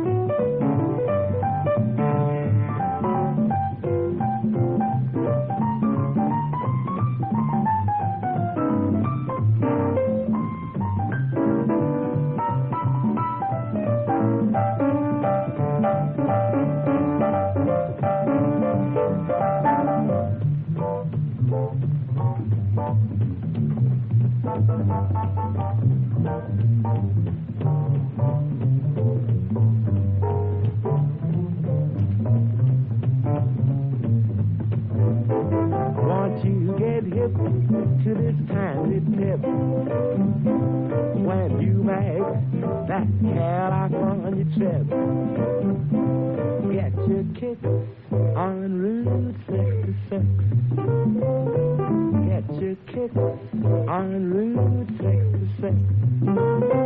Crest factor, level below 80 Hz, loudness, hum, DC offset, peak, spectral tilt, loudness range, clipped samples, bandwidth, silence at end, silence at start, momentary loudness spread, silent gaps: 12 dB; -54 dBFS; -23 LUFS; none; under 0.1%; -8 dBFS; -10.5 dB/octave; 2 LU; under 0.1%; 3.7 kHz; 0 s; 0 s; 4 LU; none